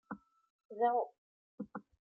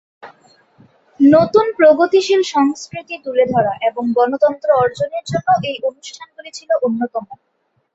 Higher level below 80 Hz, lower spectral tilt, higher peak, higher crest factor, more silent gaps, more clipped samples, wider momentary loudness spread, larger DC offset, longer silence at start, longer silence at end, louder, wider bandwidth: second, -82 dBFS vs -58 dBFS; about the same, -5 dB/octave vs -5.5 dB/octave; second, -20 dBFS vs -2 dBFS; about the same, 20 dB vs 16 dB; first, 0.50-0.59 s, 0.65-0.69 s, 1.18-1.58 s vs none; neither; about the same, 18 LU vs 16 LU; neither; second, 0.1 s vs 0.25 s; second, 0.35 s vs 0.6 s; second, -37 LUFS vs -15 LUFS; second, 4 kHz vs 8 kHz